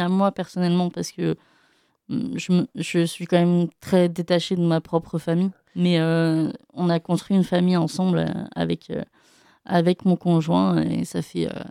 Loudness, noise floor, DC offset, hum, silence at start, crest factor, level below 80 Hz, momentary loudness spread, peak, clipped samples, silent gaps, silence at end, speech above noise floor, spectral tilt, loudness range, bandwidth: -23 LUFS; -63 dBFS; under 0.1%; none; 0 s; 16 dB; -60 dBFS; 8 LU; -6 dBFS; under 0.1%; none; 0 s; 41 dB; -7 dB/octave; 2 LU; 12.5 kHz